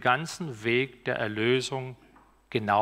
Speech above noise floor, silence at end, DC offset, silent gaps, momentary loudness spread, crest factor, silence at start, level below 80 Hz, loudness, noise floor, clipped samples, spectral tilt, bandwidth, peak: 27 dB; 0 s; under 0.1%; none; 9 LU; 20 dB; 0 s; -64 dBFS; -29 LUFS; -54 dBFS; under 0.1%; -5 dB/octave; 15 kHz; -8 dBFS